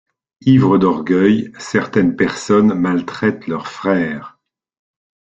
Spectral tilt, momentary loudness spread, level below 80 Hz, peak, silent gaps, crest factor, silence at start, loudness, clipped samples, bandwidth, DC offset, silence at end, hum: -7 dB/octave; 9 LU; -52 dBFS; -2 dBFS; none; 14 dB; 0.45 s; -16 LUFS; under 0.1%; 8.4 kHz; under 0.1%; 1.1 s; none